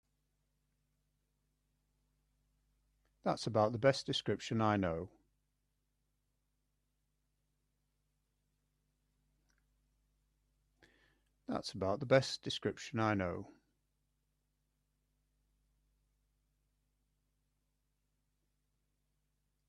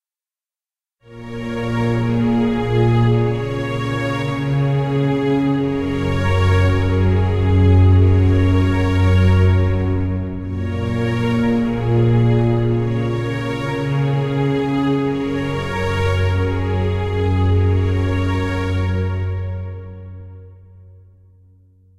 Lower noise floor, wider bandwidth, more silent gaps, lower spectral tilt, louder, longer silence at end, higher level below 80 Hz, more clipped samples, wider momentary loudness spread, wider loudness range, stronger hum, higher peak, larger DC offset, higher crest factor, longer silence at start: second, -83 dBFS vs under -90 dBFS; first, 11.5 kHz vs 8 kHz; neither; second, -5.5 dB/octave vs -8.5 dB/octave; second, -36 LUFS vs -18 LUFS; first, 6.15 s vs 1.15 s; second, -74 dBFS vs -34 dBFS; neither; about the same, 11 LU vs 9 LU; first, 11 LU vs 5 LU; first, 50 Hz at -70 dBFS vs none; second, -16 dBFS vs -4 dBFS; neither; first, 26 dB vs 14 dB; first, 3.25 s vs 1.1 s